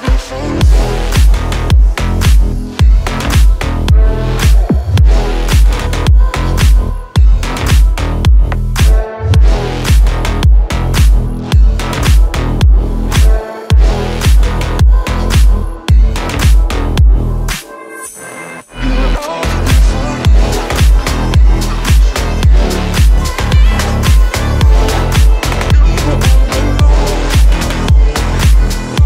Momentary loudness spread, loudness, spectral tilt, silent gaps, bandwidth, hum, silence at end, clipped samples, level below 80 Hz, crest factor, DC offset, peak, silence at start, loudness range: 4 LU; -12 LUFS; -5.5 dB/octave; none; 15.5 kHz; none; 0 s; under 0.1%; -10 dBFS; 8 dB; under 0.1%; 0 dBFS; 0 s; 2 LU